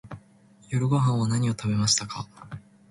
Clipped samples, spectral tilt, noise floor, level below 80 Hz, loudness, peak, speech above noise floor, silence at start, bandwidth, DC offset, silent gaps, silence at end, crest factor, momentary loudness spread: under 0.1%; -4.5 dB/octave; -56 dBFS; -56 dBFS; -25 LUFS; -8 dBFS; 31 dB; 0.05 s; 11.5 kHz; under 0.1%; none; 0.3 s; 18 dB; 21 LU